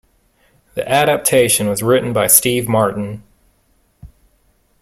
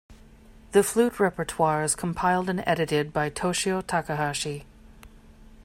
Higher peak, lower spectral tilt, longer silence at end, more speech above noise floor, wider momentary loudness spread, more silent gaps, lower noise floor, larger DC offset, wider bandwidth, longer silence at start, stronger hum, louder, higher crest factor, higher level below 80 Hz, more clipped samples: first, 0 dBFS vs -6 dBFS; about the same, -3.5 dB/octave vs -4.5 dB/octave; first, 0.75 s vs 0 s; first, 44 dB vs 25 dB; first, 16 LU vs 5 LU; neither; first, -59 dBFS vs -50 dBFS; neither; about the same, 16.5 kHz vs 16 kHz; first, 0.75 s vs 0.1 s; neither; first, -14 LUFS vs -25 LUFS; about the same, 18 dB vs 20 dB; about the same, -50 dBFS vs -52 dBFS; neither